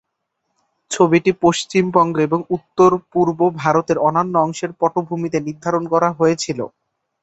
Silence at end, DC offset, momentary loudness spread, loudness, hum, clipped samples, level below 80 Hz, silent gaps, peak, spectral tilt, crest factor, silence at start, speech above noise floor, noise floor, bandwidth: 0.55 s; under 0.1%; 8 LU; -17 LUFS; none; under 0.1%; -56 dBFS; none; -2 dBFS; -5.5 dB/octave; 16 dB; 0.9 s; 57 dB; -74 dBFS; 8.2 kHz